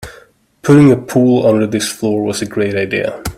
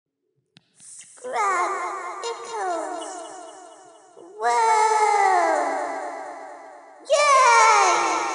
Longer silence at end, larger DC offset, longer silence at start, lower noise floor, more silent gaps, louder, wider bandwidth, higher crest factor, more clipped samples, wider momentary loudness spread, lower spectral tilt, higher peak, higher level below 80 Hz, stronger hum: about the same, 0.05 s vs 0 s; neither; second, 0 s vs 0.85 s; second, -45 dBFS vs -74 dBFS; neither; first, -13 LUFS vs -20 LUFS; first, 15.5 kHz vs 11.5 kHz; about the same, 14 dB vs 18 dB; neither; second, 9 LU vs 23 LU; first, -6 dB/octave vs 0.5 dB/octave; first, 0 dBFS vs -4 dBFS; first, -42 dBFS vs under -90 dBFS; neither